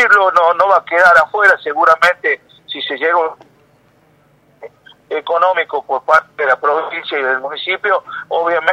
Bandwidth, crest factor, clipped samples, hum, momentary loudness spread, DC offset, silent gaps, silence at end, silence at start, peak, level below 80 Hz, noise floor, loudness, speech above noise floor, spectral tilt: 15 kHz; 14 dB; under 0.1%; none; 12 LU; under 0.1%; none; 0 s; 0 s; 0 dBFS; -60 dBFS; -52 dBFS; -13 LUFS; 38 dB; -2.5 dB/octave